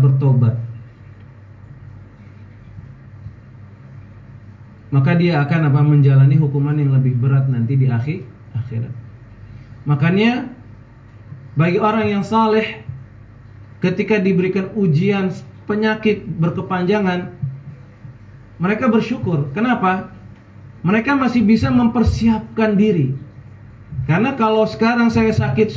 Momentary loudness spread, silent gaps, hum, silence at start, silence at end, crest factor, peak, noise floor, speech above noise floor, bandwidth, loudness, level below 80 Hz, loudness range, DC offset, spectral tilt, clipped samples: 18 LU; none; none; 0 s; 0 s; 14 dB; -4 dBFS; -41 dBFS; 25 dB; 7.4 kHz; -17 LUFS; -40 dBFS; 6 LU; under 0.1%; -8.5 dB/octave; under 0.1%